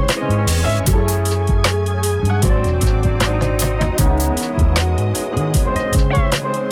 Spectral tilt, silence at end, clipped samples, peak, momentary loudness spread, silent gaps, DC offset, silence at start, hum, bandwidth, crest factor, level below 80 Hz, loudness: -5.5 dB/octave; 0 s; under 0.1%; -4 dBFS; 3 LU; none; under 0.1%; 0 s; none; 18 kHz; 10 dB; -20 dBFS; -17 LUFS